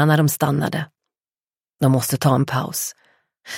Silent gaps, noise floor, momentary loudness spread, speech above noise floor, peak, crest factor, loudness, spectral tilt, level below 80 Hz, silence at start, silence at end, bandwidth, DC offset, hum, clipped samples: 1.43-1.47 s; under -90 dBFS; 11 LU; over 72 dB; -4 dBFS; 16 dB; -20 LUFS; -5.5 dB/octave; -58 dBFS; 0 s; 0 s; 16.5 kHz; under 0.1%; none; under 0.1%